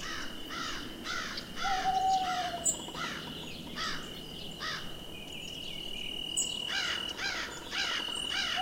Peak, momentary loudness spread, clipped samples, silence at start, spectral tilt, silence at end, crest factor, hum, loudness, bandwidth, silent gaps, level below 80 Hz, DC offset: -16 dBFS; 10 LU; under 0.1%; 0 s; -1 dB/octave; 0 s; 20 dB; none; -34 LUFS; 16.5 kHz; none; -52 dBFS; under 0.1%